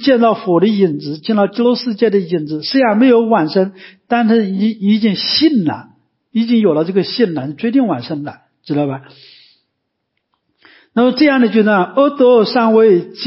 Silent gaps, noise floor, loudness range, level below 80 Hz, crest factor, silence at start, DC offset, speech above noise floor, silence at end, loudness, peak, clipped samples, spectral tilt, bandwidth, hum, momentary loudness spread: none; -72 dBFS; 7 LU; -62 dBFS; 14 dB; 0 s; under 0.1%; 59 dB; 0 s; -14 LUFS; 0 dBFS; under 0.1%; -10 dB/octave; 5.8 kHz; none; 11 LU